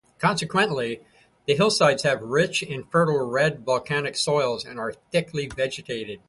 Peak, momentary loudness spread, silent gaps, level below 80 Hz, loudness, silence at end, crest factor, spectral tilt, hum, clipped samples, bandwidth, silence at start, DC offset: -6 dBFS; 11 LU; none; -58 dBFS; -24 LUFS; 0.1 s; 18 dB; -4.5 dB/octave; none; under 0.1%; 11.5 kHz; 0.2 s; under 0.1%